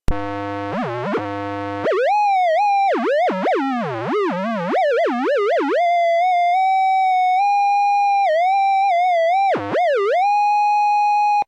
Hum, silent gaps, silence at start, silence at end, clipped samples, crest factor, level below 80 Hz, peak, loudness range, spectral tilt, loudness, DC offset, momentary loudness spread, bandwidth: none; none; 0.1 s; 0.05 s; under 0.1%; 12 dB; -38 dBFS; -6 dBFS; 3 LU; -5.5 dB/octave; -18 LUFS; under 0.1%; 7 LU; 9.4 kHz